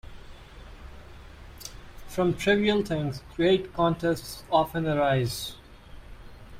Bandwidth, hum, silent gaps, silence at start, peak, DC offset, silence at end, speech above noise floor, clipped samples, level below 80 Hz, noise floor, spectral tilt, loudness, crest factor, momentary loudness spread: 16 kHz; none; none; 0.05 s; -10 dBFS; under 0.1%; 0 s; 20 dB; under 0.1%; -48 dBFS; -46 dBFS; -5.5 dB/octave; -26 LUFS; 18 dB; 25 LU